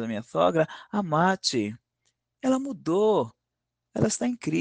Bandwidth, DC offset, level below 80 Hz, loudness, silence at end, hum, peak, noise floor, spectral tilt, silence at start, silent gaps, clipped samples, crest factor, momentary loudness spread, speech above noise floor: 10 kHz; under 0.1%; -64 dBFS; -26 LUFS; 0 s; none; -8 dBFS; -84 dBFS; -5 dB/octave; 0 s; none; under 0.1%; 18 dB; 8 LU; 59 dB